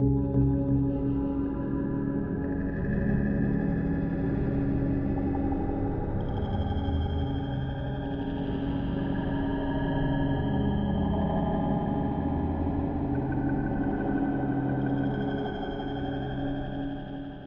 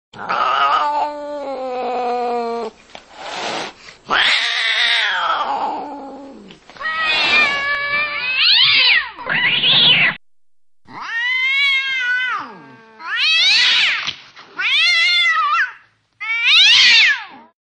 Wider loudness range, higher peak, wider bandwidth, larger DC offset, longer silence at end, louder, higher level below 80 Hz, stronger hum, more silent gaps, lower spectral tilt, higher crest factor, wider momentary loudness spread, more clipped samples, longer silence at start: second, 2 LU vs 8 LU; second, -14 dBFS vs -2 dBFS; second, 4 kHz vs 10.5 kHz; neither; second, 0 s vs 0.2 s; second, -29 LUFS vs -14 LUFS; first, -36 dBFS vs -58 dBFS; neither; neither; first, -8 dB/octave vs -0.5 dB/octave; about the same, 14 dB vs 16 dB; second, 5 LU vs 18 LU; neither; second, 0 s vs 0.15 s